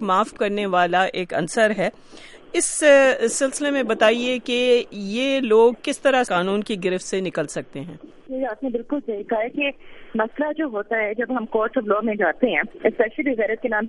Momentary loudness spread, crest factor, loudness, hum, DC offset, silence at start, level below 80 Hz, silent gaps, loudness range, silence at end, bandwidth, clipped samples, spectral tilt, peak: 10 LU; 18 dB; -21 LUFS; none; under 0.1%; 0 s; -54 dBFS; none; 7 LU; 0 s; 11.5 kHz; under 0.1%; -3.5 dB/octave; -4 dBFS